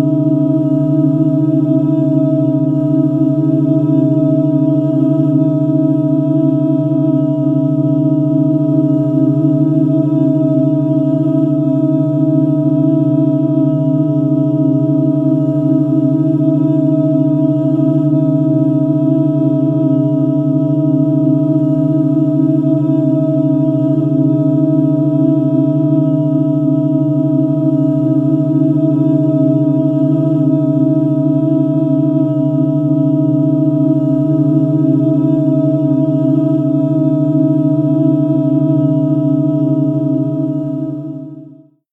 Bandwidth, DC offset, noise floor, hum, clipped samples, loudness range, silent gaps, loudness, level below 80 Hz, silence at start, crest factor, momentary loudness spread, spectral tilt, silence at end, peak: 3.7 kHz; under 0.1%; -39 dBFS; none; under 0.1%; 0 LU; none; -13 LUFS; -54 dBFS; 0 s; 10 dB; 1 LU; -12.5 dB/octave; 0.45 s; -2 dBFS